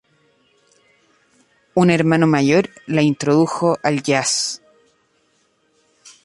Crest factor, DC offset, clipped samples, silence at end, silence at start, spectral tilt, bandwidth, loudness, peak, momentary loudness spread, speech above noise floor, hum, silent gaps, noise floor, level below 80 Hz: 18 dB; under 0.1%; under 0.1%; 1.7 s; 1.75 s; -5 dB/octave; 11.5 kHz; -17 LUFS; -2 dBFS; 7 LU; 46 dB; none; none; -62 dBFS; -60 dBFS